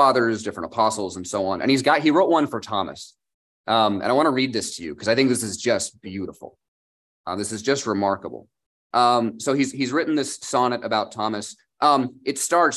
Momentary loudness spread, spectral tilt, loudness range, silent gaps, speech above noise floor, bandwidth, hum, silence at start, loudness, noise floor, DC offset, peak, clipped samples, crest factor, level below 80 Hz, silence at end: 14 LU; -4 dB/octave; 4 LU; 3.34-3.64 s, 6.68-7.24 s, 8.66-8.90 s; over 68 dB; 13 kHz; none; 0 s; -22 LUFS; under -90 dBFS; under 0.1%; -4 dBFS; under 0.1%; 18 dB; -60 dBFS; 0 s